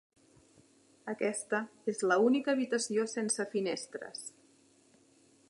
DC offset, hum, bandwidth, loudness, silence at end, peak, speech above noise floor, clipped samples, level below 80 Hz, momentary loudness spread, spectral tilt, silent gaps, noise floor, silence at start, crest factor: under 0.1%; none; 11.5 kHz; -33 LUFS; 1.2 s; -14 dBFS; 33 dB; under 0.1%; -86 dBFS; 15 LU; -3.5 dB/octave; none; -65 dBFS; 1.05 s; 20 dB